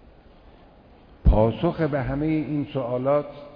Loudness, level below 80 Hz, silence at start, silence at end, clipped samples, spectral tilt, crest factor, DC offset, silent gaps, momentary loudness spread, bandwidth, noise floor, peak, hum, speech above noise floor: -24 LUFS; -30 dBFS; 1.25 s; 0 s; under 0.1%; -11 dB/octave; 18 dB; under 0.1%; none; 7 LU; 5.2 kHz; -51 dBFS; -6 dBFS; none; 27 dB